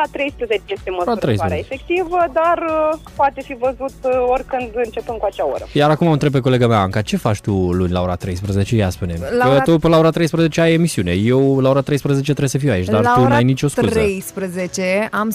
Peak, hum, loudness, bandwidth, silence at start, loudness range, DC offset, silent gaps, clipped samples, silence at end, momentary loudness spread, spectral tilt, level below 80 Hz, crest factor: -4 dBFS; none; -17 LUFS; 15.5 kHz; 0 s; 4 LU; under 0.1%; none; under 0.1%; 0 s; 9 LU; -6.5 dB/octave; -40 dBFS; 12 dB